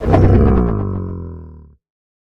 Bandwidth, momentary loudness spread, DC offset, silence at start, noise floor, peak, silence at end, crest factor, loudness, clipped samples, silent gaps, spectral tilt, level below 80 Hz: 5.8 kHz; 20 LU; under 0.1%; 0 s; -38 dBFS; 0 dBFS; 0.6 s; 16 dB; -15 LUFS; under 0.1%; none; -10.5 dB/octave; -22 dBFS